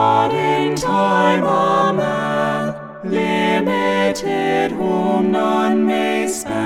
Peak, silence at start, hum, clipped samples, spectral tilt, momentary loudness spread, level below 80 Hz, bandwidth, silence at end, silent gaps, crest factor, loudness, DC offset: -2 dBFS; 0 s; none; under 0.1%; -5 dB/octave; 5 LU; -52 dBFS; 16 kHz; 0 s; none; 14 dB; -17 LUFS; under 0.1%